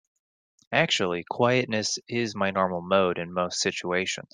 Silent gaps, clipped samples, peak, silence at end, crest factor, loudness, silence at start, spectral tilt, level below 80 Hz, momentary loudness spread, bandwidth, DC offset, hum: none; under 0.1%; -6 dBFS; 0.1 s; 22 dB; -26 LUFS; 0.7 s; -3.5 dB/octave; -70 dBFS; 5 LU; 10.5 kHz; under 0.1%; none